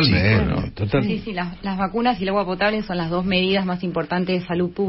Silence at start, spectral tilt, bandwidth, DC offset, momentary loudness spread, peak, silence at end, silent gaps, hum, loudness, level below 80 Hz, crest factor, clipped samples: 0 s; -10.5 dB/octave; 5.8 kHz; under 0.1%; 7 LU; -6 dBFS; 0 s; none; none; -21 LUFS; -38 dBFS; 16 dB; under 0.1%